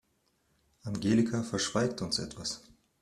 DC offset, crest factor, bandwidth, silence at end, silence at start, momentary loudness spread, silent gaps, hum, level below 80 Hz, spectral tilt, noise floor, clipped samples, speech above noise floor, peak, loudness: under 0.1%; 20 dB; 13 kHz; 0.4 s; 0.85 s; 12 LU; none; none; -62 dBFS; -4.5 dB/octave; -74 dBFS; under 0.1%; 43 dB; -14 dBFS; -31 LUFS